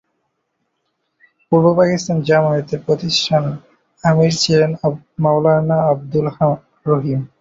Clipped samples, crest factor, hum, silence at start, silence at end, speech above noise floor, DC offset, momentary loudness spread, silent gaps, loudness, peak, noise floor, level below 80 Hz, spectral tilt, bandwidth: under 0.1%; 14 dB; none; 1.5 s; 0.15 s; 55 dB; under 0.1%; 7 LU; none; -16 LUFS; -2 dBFS; -71 dBFS; -54 dBFS; -6 dB/octave; 7.8 kHz